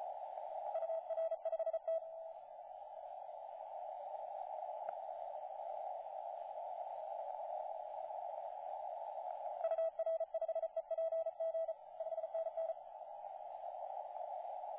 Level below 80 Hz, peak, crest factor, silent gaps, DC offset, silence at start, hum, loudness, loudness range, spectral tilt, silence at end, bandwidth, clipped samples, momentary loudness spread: -90 dBFS; -28 dBFS; 14 dB; none; under 0.1%; 0 s; none; -44 LUFS; 6 LU; 0 dB/octave; 0 s; 3.9 kHz; under 0.1%; 10 LU